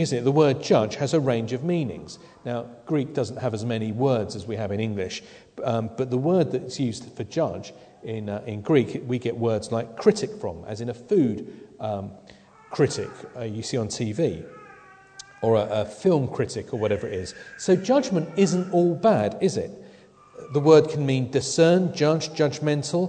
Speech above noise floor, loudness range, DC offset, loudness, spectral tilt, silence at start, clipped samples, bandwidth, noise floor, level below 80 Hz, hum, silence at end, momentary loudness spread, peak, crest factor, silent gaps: 27 dB; 6 LU; under 0.1%; -24 LUFS; -6 dB/octave; 0 s; under 0.1%; 9.4 kHz; -51 dBFS; -60 dBFS; none; 0 s; 15 LU; -4 dBFS; 22 dB; none